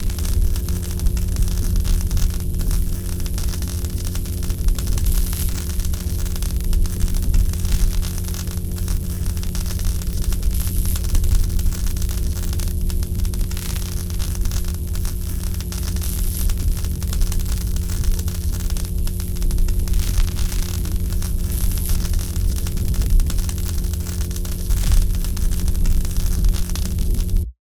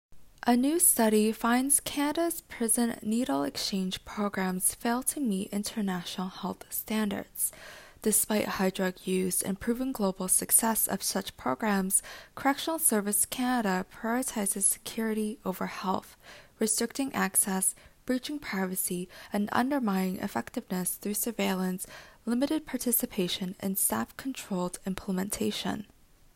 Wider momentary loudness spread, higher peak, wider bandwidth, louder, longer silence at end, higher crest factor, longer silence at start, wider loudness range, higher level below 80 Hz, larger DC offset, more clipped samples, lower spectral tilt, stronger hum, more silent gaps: second, 4 LU vs 10 LU; first, -4 dBFS vs -8 dBFS; first, over 20 kHz vs 16.5 kHz; first, -24 LUFS vs -29 LUFS; second, 0.1 s vs 0.5 s; about the same, 16 dB vs 20 dB; about the same, 0 s vs 0.1 s; about the same, 2 LU vs 4 LU; first, -20 dBFS vs -60 dBFS; neither; neither; first, -5 dB/octave vs -3.5 dB/octave; neither; neither